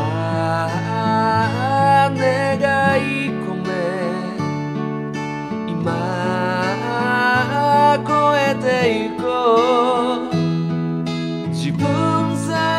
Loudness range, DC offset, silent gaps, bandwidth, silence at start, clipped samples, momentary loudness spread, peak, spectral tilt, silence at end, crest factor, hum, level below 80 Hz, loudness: 6 LU; under 0.1%; none; 13.5 kHz; 0 s; under 0.1%; 9 LU; -4 dBFS; -6 dB/octave; 0 s; 16 dB; none; -56 dBFS; -18 LUFS